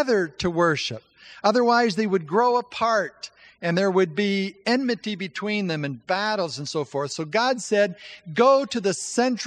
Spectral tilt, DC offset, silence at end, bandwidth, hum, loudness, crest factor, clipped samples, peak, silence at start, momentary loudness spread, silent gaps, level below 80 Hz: -4.5 dB/octave; under 0.1%; 0 s; 10.5 kHz; none; -23 LUFS; 18 dB; under 0.1%; -4 dBFS; 0 s; 10 LU; none; -62 dBFS